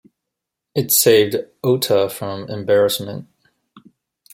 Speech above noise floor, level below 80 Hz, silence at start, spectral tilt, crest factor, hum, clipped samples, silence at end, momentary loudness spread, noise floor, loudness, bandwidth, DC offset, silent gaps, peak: 64 dB; -62 dBFS; 0.75 s; -3.5 dB/octave; 18 dB; none; under 0.1%; 0.55 s; 14 LU; -82 dBFS; -17 LUFS; 16.5 kHz; under 0.1%; none; -2 dBFS